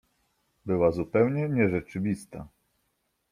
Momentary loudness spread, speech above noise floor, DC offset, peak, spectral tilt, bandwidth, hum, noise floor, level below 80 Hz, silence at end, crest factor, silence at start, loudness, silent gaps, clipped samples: 18 LU; 50 dB; under 0.1%; -10 dBFS; -8.5 dB/octave; 14.5 kHz; none; -76 dBFS; -58 dBFS; 0.85 s; 20 dB; 0.65 s; -27 LUFS; none; under 0.1%